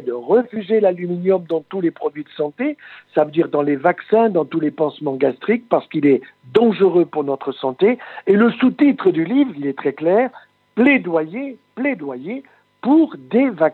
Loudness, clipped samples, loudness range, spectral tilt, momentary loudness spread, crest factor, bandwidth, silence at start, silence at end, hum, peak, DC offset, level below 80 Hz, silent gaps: -18 LUFS; under 0.1%; 3 LU; -9 dB/octave; 11 LU; 18 dB; 4.4 kHz; 0 s; 0 s; none; 0 dBFS; under 0.1%; -70 dBFS; none